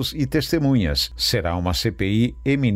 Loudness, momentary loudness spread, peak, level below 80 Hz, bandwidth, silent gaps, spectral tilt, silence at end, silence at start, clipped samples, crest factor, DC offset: -21 LUFS; 3 LU; -8 dBFS; -34 dBFS; 16 kHz; none; -5.5 dB/octave; 0 s; 0 s; under 0.1%; 14 dB; under 0.1%